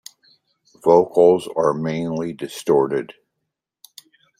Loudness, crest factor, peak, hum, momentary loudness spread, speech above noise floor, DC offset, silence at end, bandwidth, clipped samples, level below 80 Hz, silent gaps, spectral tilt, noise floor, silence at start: -19 LUFS; 18 dB; -2 dBFS; none; 12 LU; 61 dB; under 0.1%; 1.3 s; 15.5 kHz; under 0.1%; -62 dBFS; none; -6.5 dB/octave; -79 dBFS; 0.85 s